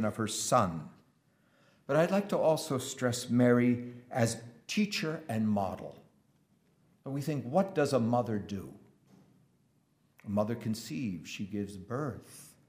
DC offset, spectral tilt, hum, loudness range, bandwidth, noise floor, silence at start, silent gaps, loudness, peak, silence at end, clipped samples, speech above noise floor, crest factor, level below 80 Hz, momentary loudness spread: under 0.1%; -5.5 dB/octave; none; 8 LU; 15.5 kHz; -71 dBFS; 0 s; none; -32 LUFS; -12 dBFS; 0.2 s; under 0.1%; 40 dB; 20 dB; -72 dBFS; 15 LU